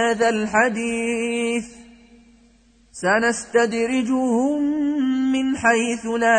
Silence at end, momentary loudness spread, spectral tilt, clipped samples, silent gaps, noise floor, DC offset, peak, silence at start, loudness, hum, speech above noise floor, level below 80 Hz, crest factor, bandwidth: 0 s; 5 LU; -4 dB/octave; under 0.1%; none; -55 dBFS; under 0.1%; -4 dBFS; 0 s; -20 LUFS; none; 35 dB; -56 dBFS; 16 dB; 9.4 kHz